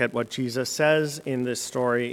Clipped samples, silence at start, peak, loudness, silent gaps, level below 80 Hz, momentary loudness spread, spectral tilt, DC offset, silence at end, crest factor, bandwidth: under 0.1%; 0 s; -8 dBFS; -25 LUFS; none; -68 dBFS; 7 LU; -4.5 dB/octave; under 0.1%; 0 s; 18 dB; 17 kHz